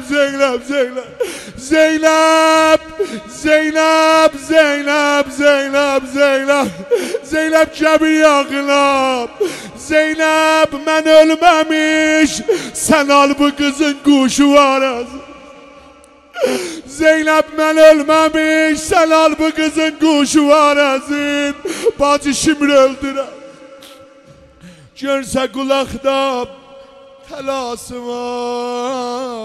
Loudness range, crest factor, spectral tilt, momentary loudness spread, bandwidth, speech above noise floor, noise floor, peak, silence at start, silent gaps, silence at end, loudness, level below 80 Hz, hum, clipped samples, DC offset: 8 LU; 14 dB; -2.5 dB/octave; 12 LU; 15 kHz; 30 dB; -43 dBFS; 0 dBFS; 0 s; none; 0 s; -13 LUFS; -46 dBFS; none; under 0.1%; under 0.1%